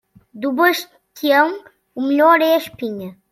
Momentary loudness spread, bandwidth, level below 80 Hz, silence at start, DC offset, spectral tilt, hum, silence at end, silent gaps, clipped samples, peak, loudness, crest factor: 19 LU; 16.5 kHz; -66 dBFS; 0.35 s; under 0.1%; -4 dB/octave; none; 0.2 s; none; under 0.1%; -2 dBFS; -17 LUFS; 16 dB